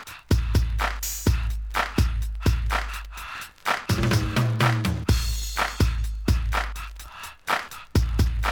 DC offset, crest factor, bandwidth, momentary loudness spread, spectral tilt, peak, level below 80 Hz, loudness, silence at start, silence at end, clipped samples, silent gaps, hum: under 0.1%; 18 dB; over 20 kHz; 12 LU; -5 dB/octave; -8 dBFS; -28 dBFS; -25 LUFS; 0 s; 0 s; under 0.1%; none; none